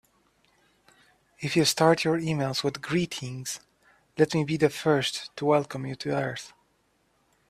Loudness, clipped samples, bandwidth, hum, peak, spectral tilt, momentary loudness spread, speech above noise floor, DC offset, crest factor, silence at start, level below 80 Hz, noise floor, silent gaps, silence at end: -26 LUFS; under 0.1%; 15.5 kHz; none; -6 dBFS; -4.5 dB/octave; 14 LU; 43 dB; under 0.1%; 22 dB; 1.4 s; -64 dBFS; -69 dBFS; none; 1 s